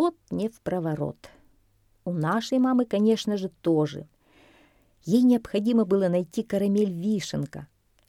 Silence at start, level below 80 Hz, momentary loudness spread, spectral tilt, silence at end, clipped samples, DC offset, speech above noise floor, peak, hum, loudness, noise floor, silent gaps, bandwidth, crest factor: 0 s; -62 dBFS; 11 LU; -7 dB/octave; 0.45 s; under 0.1%; under 0.1%; 39 dB; -10 dBFS; none; -25 LUFS; -64 dBFS; none; 13.5 kHz; 14 dB